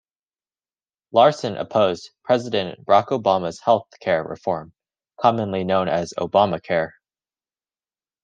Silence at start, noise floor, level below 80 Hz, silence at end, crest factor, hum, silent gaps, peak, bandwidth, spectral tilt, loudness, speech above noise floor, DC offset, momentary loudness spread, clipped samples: 1.15 s; under -90 dBFS; -64 dBFS; 1.35 s; 20 dB; none; none; -2 dBFS; 9 kHz; -5.5 dB/octave; -21 LUFS; over 70 dB; under 0.1%; 9 LU; under 0.1%